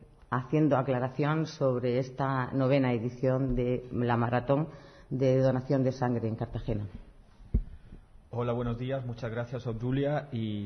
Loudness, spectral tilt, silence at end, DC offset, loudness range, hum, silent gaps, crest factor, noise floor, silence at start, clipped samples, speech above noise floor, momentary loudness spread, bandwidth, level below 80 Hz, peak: -30 LUFS; -8.5 dB/octave; 0 s; under 0.1%; 7 LU; none; none; 18 dB; -53 dBFS; 0 s; under 0.1%; 24 dB; 9 LU; 6.4 kHz; -46 dBFS; -12 dBFS